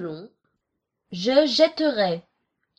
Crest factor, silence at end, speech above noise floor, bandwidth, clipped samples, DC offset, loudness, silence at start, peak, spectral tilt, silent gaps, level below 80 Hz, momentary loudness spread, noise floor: 20 dB; 0.6 s; 59 dB; 8.4 kHz; under 0.1%; under 0.1%; -21 LUFS; 0 s; -4 dBFS; -4.5 dB/octave; none; -70 dBFS; 18 LU; -80 dBFS